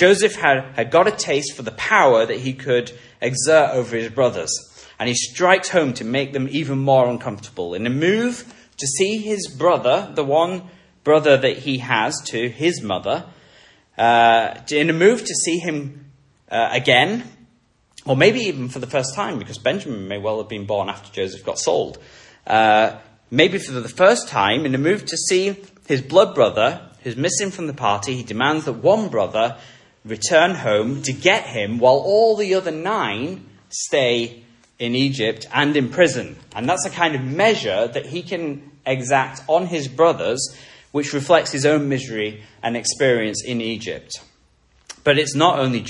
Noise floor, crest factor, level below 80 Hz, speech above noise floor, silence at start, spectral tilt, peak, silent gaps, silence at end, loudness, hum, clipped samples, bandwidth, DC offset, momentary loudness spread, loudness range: -59 dBFS; 20 dB; -60 dBFS; 41 dB; 0 s; -4 dB/octave; 0 dBFS; none; 0 s; -19 LUFS; none; under 0.1%; 11.5 kHz; under 0.1%; 12 LU; 4 LU